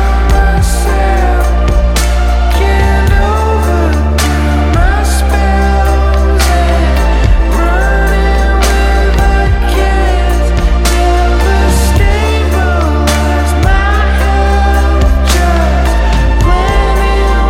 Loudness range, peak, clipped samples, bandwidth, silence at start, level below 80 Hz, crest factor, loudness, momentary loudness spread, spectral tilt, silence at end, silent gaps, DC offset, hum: 0 LU; 0 dBFS; under 0.1%; 15.5 kHz; 0 s; -10 dBFS; 8 dB; -11 LUFS; 2 LU; -5.5 dB/octave; 0 s; none; under 0.1%; none